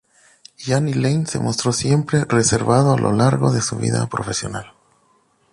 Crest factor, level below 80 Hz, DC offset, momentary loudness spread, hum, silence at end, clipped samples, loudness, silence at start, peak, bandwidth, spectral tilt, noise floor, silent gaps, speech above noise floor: 16 dB; -48 dBFS; under 0.1%; 8 LU; none; 0.85 s; under 0.1%; -18 LUFS; 0.6 s; -4 dBFS; 11.5 kHz; -5 dB/octave; -60 dBFS; none; 42 dB